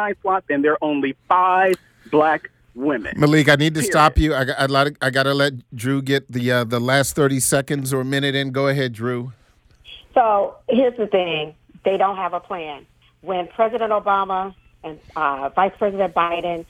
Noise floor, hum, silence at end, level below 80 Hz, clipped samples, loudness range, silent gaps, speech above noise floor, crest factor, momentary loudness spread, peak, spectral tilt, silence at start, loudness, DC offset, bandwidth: -53 dBFS; none; 0.05 s; -38 dBFS; under 0.1%; 5 LU; none; 34 dB; 16 dB; 12 LU; -2 dBFS; -5 dB/octave; 0 s; -19 LUFS; under 0.1%; 18 kHz